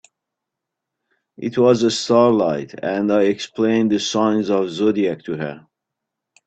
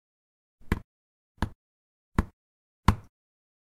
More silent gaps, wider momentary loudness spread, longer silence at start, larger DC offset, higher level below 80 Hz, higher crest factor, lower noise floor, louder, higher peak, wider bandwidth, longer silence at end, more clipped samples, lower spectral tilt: second, none vs 0.84-1.35 s, 1.55-2.12 s, 2.33-2.83 s; about the same, 11 LU vs 9 LU; first, 1.4 s vs 0.65 s; neither; second, -62 dBFS vs -38 dBFS; second, 20 dB vs 32 dB; second, -82 dBFS vs under -90 dBFS; first, -18 LUFS vs -32 LUFS; about the same, 0 dBFS vs -2 dBFS; second, 8.8 kHz vs 15.5 kHz; first, 0.9 s vs 0.65 s; neither; about the same, -5.5 dB/octave vs -6.5 dB/octave